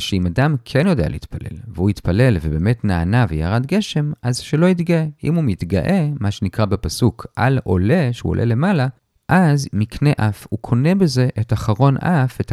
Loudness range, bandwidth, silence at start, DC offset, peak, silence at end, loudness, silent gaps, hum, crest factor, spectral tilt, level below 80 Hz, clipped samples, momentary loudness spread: 1 LU; 13.5 kHz; 0 s; under 0.1%; 0 dBFS; 0 s; -18 LUFS; none; none; 16 dB; -7 dB/octave; -36 dBFS; under 0.1%; 6 LU